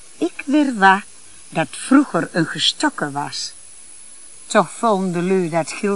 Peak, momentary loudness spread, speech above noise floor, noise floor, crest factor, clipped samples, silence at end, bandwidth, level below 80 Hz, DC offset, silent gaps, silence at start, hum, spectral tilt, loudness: 0 dBFS; 24 LU; 24 dB; -41 dBFS; 20 dB; under 0.1%; 0 s; 11.5 kHz; -66 dBFS; 0.8%; none; 0.2 s; none; -4 dB/octave; -18 LUFS